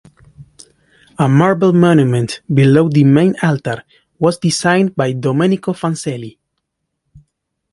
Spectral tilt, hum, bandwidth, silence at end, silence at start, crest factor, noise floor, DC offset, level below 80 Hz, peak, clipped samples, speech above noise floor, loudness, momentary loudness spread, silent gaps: -6.5 dB/octave; none; 11.5 kHz; 1.4 s; 0.4 s; 14 dB; -73 dBFS; under 0.1%; -54 dBFS; 0 dBFS; under 0.1%; 60 dB; -14 LUFS; 11 LU; none